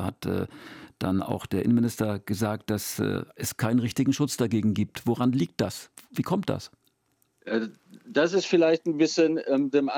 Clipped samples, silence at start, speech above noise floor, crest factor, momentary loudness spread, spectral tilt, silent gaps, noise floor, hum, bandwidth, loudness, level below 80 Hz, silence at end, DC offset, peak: under 0.1%; 0 s; 45 dB; 18 dB; 11 LU; -6 dB/octave; none; -71 dBFS; none; 18 kHz; -26 LUFS; -64 dBFS; 0 s; under 0.1%; -10 dBFS